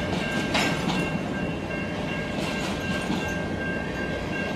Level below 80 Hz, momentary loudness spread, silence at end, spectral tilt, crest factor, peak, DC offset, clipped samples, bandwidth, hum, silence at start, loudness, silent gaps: -44 dBFS; 6 LU; 0 s; -5 dB/octave; 18 dB; -10 dBFS; under 0.1%; under 0.1%; 15.5 kHz; none; 0 s; -27 LUFS; none